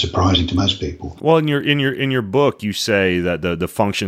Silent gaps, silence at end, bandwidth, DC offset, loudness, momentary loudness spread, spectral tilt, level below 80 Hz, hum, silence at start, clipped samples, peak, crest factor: none; 0 s; 15.5 kHz; under 0.1%; -18 LUFS; 6 LU; -5.5 dB/octave; -38 dBFS; none; 0 s; under 0.1%; -2 dBFS; 16 dB